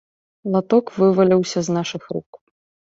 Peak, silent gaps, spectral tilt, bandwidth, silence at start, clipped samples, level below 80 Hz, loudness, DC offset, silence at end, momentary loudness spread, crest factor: -4 dBFS; 2.26-2.33 s; -6.5 dB/octave; 7.8 kHz; 0.45 s; under 0.1%; -62 dBFS; -19 LUFS; under 0.1%; 0.6 s; 15 LU; 16 dB